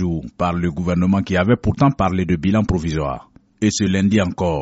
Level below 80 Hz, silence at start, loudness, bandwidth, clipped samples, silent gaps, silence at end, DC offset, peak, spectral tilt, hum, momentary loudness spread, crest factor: -36 dBFS; 0 s; -19 LUFS; 8 kHz; under 0.1%; none; 0 s; under 0.1%; -2 dBFS; -6.5 dB/octave; none; 6 LU; 16 dB